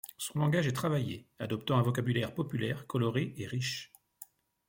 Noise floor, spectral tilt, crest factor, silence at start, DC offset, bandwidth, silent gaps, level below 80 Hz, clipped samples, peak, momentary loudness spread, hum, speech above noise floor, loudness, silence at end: -56 dBFS; -6 dB/octave; 18 dB; 0.05 s; under 0.1%; 17 kHz; none; -66 dBFS; under 0.1%; -16 dBFS; 20 LU; none; 24 dB; -33 LUFS; 0.45 s